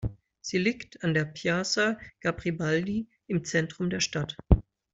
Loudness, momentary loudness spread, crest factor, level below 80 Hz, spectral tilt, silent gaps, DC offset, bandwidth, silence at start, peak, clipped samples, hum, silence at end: -29 LUFS; 7 LU; 26 dB; -38 dBFS; -5 dB/octave; none; under 0.1%; 8 kHz; 0 s; -4 dBFS; under 0.1%; none; 0.3 s